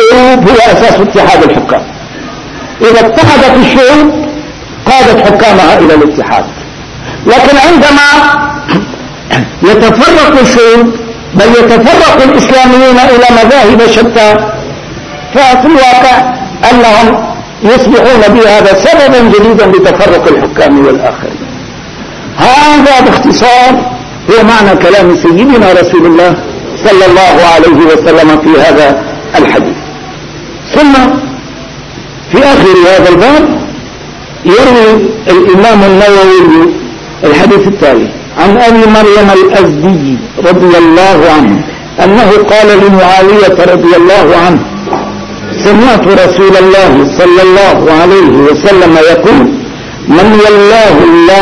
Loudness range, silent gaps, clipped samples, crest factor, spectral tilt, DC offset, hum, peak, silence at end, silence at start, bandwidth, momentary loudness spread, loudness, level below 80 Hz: 3 LU; none; 10%; 4 dB; -5 dB/octave; 2%; none; 0 dBFS; 0 s; 0 s; 11 kHz; 15 LU; -3 LUFS; -28 dBFS